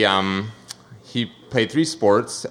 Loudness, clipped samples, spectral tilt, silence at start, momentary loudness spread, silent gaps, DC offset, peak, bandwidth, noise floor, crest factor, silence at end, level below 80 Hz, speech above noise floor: -21 LUFS; under 0.1%; -4.5 dB/octave; 0 s; 20 LU; none; under 0.1%; -2 dBFS; 14.5 kHz; -42 dBFS; 20 dB; 0 s; -60 dBFS; 21 dB